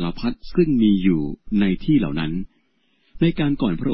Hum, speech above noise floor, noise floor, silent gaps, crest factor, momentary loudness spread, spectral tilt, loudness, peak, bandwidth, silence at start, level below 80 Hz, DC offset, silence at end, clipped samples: none; 46 dB; -65 dBFS; none; 14 dB; 10 LU; -11.5 dB/octave; -21 LUFS; -6 dBFS; 5.8 kHz; 0 s; -36 dBFS; under 0.1%; 0 s; under 0.1%